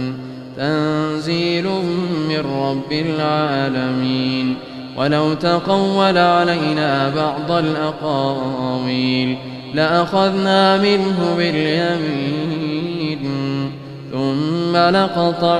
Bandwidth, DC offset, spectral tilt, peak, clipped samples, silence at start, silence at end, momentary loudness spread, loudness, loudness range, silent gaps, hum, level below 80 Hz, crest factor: 11.5 kHz; under 0.1%; -6.5 dB/octave; 0 dBFS; under 0.1%; 0 s; 0 s; 8 LU; -18 LUFS; 3 LU; none; none; -54 dBFS; 16 dB